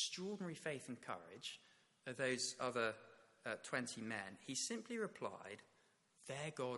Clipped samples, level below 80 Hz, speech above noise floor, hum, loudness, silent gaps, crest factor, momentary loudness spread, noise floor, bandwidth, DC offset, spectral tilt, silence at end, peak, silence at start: under 0.1%; -88 dBFS; 30 dB; none; -45 LUFS; none; 22 dB; 15 LU; -76 dBFS; 11.5 kHz; under 0.1%; -3 dB/octave; 0 s; -26 dBFS; 0 s